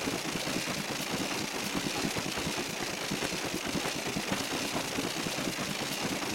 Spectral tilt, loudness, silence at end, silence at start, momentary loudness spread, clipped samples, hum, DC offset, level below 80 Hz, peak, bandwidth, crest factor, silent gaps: -3 dB/octave; -32 LUFS; 0 s; 0 s; 1 LU; under 0.1%; none; under 0.1%; -58 dBFS; -16 dBFS; 16.5 kHz; 18 dB; none